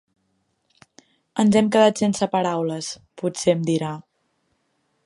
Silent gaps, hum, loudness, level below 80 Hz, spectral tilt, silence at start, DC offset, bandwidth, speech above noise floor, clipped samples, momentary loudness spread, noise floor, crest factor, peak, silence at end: none; none; -21 LUFS; -64 dBFS; -5.5 dB/octave; 1.35 s; under 0.1%; 11.5 kHz; 50 dB; under 0.1%; 14 LU; -70 dBFS; 20 dB; -4 dBFS; 1.05 s